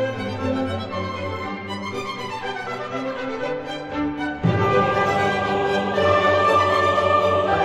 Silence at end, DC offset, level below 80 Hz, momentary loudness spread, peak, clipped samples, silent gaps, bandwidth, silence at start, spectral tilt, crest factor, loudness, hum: 0 s; under 0.1%; -50 dBFS; 11 LU; -4 dBFS; under 0.1%; none; 13.5 kHz; 0 s; -6 dB/octave; 16 dB; -22 LUFS; none